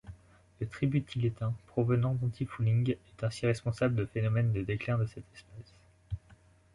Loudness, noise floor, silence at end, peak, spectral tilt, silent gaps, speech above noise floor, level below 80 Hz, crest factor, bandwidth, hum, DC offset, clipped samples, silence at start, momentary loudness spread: -32 LUFS; -60 dBFS; 0.55 s; -16 dBFS; -8 dB/octave; none; 30 dB; -54 dBFS; 16 dB; 11.5 kHz; none; under 0.1%; under 0.1%; 0.05 s; 16 LU